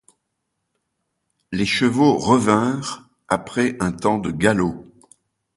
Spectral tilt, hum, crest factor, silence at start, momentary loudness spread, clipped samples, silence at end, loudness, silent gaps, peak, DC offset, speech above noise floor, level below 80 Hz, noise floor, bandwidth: -5.5 dB/octave; none; 20 dB; 1.5 s; 12 LU; under 0.1%; 0.75 s; -20 LUFS; none; 0 dBFS; under 0.1%; 57 dB; -50 dBFS; -76 dBFS; 11.5 kHz